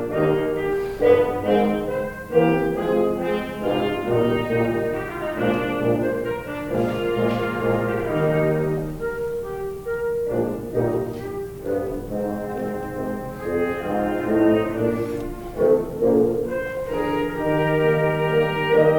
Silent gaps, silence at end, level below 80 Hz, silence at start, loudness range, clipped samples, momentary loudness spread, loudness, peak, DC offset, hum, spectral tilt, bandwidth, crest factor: none; 0 s; -44 dBFS; 0 s; 5 LU; under 0.1%; 9 LU; -22 LUFS; -4 dBFS; under 0.1%; none; -7.5 dB/octave; 19.5 kHz; 18 dB